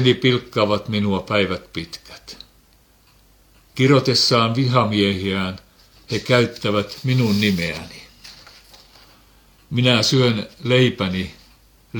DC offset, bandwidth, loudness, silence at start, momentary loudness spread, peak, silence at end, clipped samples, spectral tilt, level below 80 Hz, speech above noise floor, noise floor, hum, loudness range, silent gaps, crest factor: under 0.1%; 19 kHz; -19 LUFS; 0 s; 22 LU; -2 dBFS; 0 s; under 0.1%; -5.5 dB/octave; -52 dBFS; 36 dB; -55 dBFS; none; 5 LU; none; 20 dB